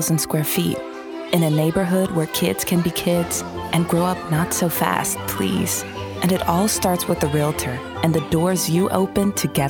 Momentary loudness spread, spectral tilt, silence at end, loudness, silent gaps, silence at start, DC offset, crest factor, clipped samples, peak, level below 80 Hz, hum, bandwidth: 5 LU; -5 dB/octave; 0 s; -20 LUFS; none; 0 s; under 0.1%; 18 dB; under 0.1%; -2 dBFS; -46 dBFS; none; 19.5 kHz